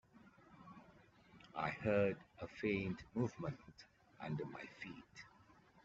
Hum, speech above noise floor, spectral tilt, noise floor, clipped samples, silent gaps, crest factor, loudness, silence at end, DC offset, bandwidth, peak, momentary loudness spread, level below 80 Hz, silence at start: none; 25 dB; -6 dB/octave; -68 dBFS; under 0.1%; none; 22 dB; -43 LUFS; 0.6 s; under 0.1%; 7.8 kHz; -24 dBFS; 24 LU; -72 dBFS; 0.15 s